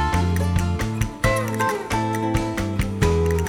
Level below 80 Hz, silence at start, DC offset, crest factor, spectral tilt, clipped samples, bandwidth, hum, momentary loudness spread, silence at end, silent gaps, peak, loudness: -30 dBFS; 0 s; under 0.1%; 16 dB; -6 dB/octave; under 0.1%; 17.5 kHz; none; 4 LU; 0 s; none; -4 dBFS; -22 LUFS